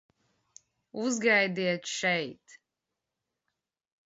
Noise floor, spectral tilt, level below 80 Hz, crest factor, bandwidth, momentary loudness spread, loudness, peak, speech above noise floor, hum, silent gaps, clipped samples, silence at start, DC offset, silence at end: -87 dBFS; -3.5 dB/octave; -80 dBFS; 22 dB; 8 kHz; 13 LU; -28 LUFS; -12 dBFS; 58 dB; none; none; under 0.1%; 0.95 s; under 0.1%; 1.5 s